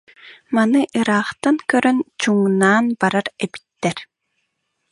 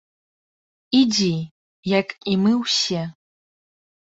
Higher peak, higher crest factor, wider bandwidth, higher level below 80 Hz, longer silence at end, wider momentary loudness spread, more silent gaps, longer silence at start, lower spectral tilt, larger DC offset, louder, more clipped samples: about the same, -2 dBFS vs -4 dBFS; about the same, 18 dB vs 18 dB; first, 11.5 kHz vs 8 kHz; about the same, -64 dBFS vs -62 dBFS; second, 0.9 s vs 1.05 s; second, 10 LU vs 13 LU; second, none vs 1.51-1.83 s; second, 0.25 s vs 0.9 s; about the same, -5 dB/octave vs -4.5 dB/octave; neither; about the same, -18 LUFS vs -20 LUFS; neither